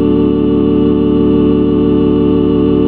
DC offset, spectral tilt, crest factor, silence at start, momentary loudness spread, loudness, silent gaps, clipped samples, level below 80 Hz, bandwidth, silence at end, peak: 2%; -12 dB/octave; 10 dB; 0 s; 1 LU; -11 LUFS; none; under 0.1%; -28 dBFS; 4.3 kHz; 0 s; 0 dBFS